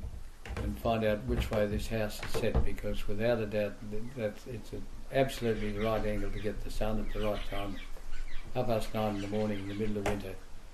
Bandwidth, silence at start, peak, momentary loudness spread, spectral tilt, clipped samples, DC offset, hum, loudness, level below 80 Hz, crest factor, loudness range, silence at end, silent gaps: 14 kHz; 0 s; -16 dBFS; 14 LU; -6 dB/octave; under 0.1%; under 0.1%; none; -34 LUFS; -40 dBFS; 16 dB; 3 LU; 0 s; none